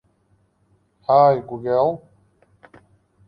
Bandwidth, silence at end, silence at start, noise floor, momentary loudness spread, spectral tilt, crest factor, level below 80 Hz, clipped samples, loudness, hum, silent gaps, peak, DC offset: 5.4 kHz; 1.3 s; 1.1 s; -63 dBFS; 16 LU; -9.5 dB/octave; 20 dB; -62 dBFS; under 0.1%; -18 LUFS; none; none; -4 dBFS; under 0.1%